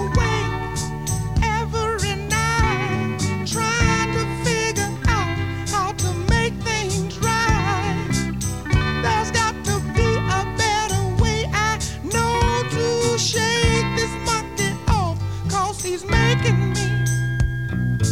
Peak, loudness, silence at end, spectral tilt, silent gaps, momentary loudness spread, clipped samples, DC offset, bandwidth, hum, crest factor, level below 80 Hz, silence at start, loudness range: -4 dBFS; -21 LUFS; 0 s; -4.5 dB/octave; none; 5 LU; under 0.1%; 0.6%; 16 kHz; none; 16 dB; -30 dBFS; 0 s; 1 LU